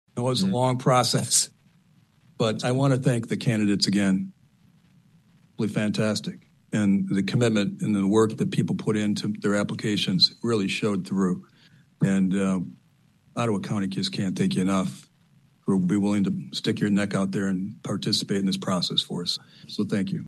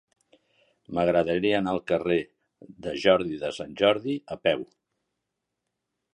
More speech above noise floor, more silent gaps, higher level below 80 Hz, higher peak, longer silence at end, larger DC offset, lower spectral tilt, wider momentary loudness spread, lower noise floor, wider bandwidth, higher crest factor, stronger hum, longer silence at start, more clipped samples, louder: second, 36 dB vs 57 dB; neither; second, -68 dBFS vs -58 dBFS; about the same, -6 dBFS vs -6 dBFS; second, 0 s vs 1.5 s; neither; about the same, -5 dB/octave vs -6 dB/octave; about the same, 9 LU vs 11 LU; second, -61 dBFS vs -83 dBFS; first, 12.5 kHz vs 11 kHz; about the same, 18 dB vs 22 dB; neither; second, 0.15 s vs 0.9 s; neither; about the same, -25 LUFS vs -26 LUFS